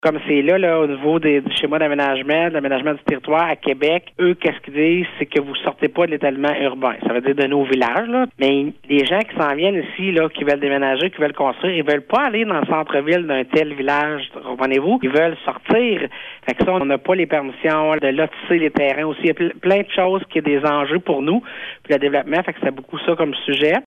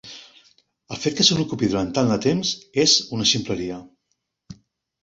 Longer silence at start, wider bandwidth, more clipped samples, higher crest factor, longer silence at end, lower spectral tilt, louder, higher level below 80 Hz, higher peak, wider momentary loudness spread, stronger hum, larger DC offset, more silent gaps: about the same, 0.05 s vs 0.05 s; first, 10 kHz vs 8 kHz; neither; second, 16 dB vs 22 dB; second, 0.05 s vs 0.5 s; first, -7 dB/octave vs -3.5 dB/octave; about the same, -18 LUFS vs -20 LUFS; about the same, -56 dBFS vs -54 dBFS; about the same, -2 dBFS vs -2 dBFS; second, 4 LU vs 18 LU; neither; neither; neither